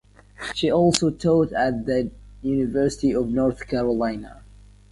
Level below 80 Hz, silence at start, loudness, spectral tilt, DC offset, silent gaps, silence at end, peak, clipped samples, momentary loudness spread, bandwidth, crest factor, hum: -44 dBFS; 0.4 s; -22 LUFS; -5.5 dB/octave; under 0.1%; none; 0.5 s; 0 dBFS; under 0.1%; 12 LU; 11.5 kHz; 22 dB; 50 Hz at -40 dBFS